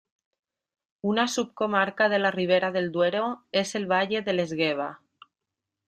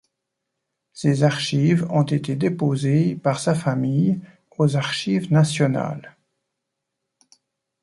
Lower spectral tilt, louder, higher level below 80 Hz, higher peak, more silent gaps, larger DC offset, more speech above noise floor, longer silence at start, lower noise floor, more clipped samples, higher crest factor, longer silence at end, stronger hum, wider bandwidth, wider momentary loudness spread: second, -4.5 dB/octave vs -6.5 dB/octave; second, -26 LUFS vs -21 LUFS; second, -72 dBFS vs -62 dBFS; second, -8 dBFS vs -4 dBFS; neither; neither; about the same, 61 dB vs 60 dB; about the same, 1.05 s vs 0.95 s; first, -86 dBFS vs -80 dBFS; neither; about the same, 18 dB vs 18 dB; second, 0.9 s vs 1.75 s; neither; first, 14 kHz vs 11.5 kHz; about the same, 5 LU vs 6 LU